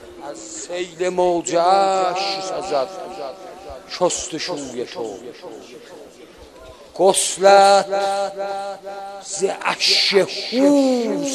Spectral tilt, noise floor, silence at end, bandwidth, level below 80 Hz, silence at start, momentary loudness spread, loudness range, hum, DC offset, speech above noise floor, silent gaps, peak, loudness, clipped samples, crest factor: -2.5 dB/octave; -43 dBFS; 0 s; 13 kHz; -58 dBFS; 0 s; 21 LU; 10 LU; none; under 0.1%; 24 dB; none; 0 dBFS; -18 LUFS; under 0.1%; 20 dB